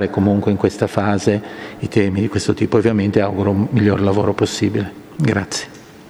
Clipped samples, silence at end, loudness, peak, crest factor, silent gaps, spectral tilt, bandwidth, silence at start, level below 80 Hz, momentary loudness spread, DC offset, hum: under 0.1%; 0 s; -17 LUFS; 0 dBFS; 18 dB; none; -6.5 dB/octave; 13 kHz; 0 s; -48 dBFS; 9 LU; under 0.1%; none